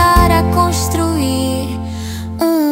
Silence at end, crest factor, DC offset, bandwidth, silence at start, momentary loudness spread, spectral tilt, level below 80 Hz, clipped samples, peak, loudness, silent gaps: 0 s; 14 dB; under 0.1%; 16.5 kHz; 0 s; 12 LU; -5.5 dB/octave; -24 dBFS; under 0.1%; 0 dBFS; -15 LUFS; none